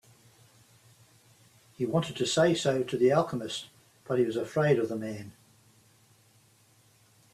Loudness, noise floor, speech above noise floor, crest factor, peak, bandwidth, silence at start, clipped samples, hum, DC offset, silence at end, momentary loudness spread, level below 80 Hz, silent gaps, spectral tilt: -28 LUFS; -63 dBFS; 35 dB; 22 dB; -10 dBFS; 14 kHz; 1.8 s; under 0.1%; none; under 0.1%; 2.05 s; 14 LU; -70 dBFS; none; -5.5 dB/octave